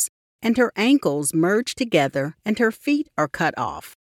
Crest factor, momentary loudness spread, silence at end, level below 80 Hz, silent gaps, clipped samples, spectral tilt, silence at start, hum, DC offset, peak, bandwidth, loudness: 18 dB; 7 LU; 0.1 s; -60 dBFS; 0.09-0.39 s; under 0.1%; -4.5 dB/octave; 0 s; none; under 0.1%; -4 dBFS; 16.5 kHz; -22 LUFS